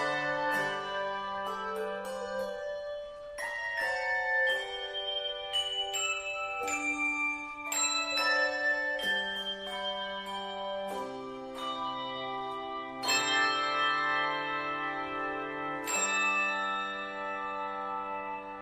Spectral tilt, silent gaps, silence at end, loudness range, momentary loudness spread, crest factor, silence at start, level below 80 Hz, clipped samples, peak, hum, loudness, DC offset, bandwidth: -1 dB/octave; none; 0 s; 6 LU; 10 LU; 18 dB; 0 s; -66 dBFS; under 0.1%; -16 dBFS; none; -32 LUFS; under 0.1%; 15.5 kHz